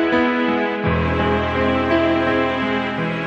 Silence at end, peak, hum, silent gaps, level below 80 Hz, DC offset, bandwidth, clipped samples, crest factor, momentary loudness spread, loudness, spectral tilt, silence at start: 0 s; -6 dBFS; none; none; -36 dBFS; under 0.1%; 7.8 kHz; under 0.1%; 12 dB; 3 LU; -19 LUFS; -7.5 dB/octave; 0 s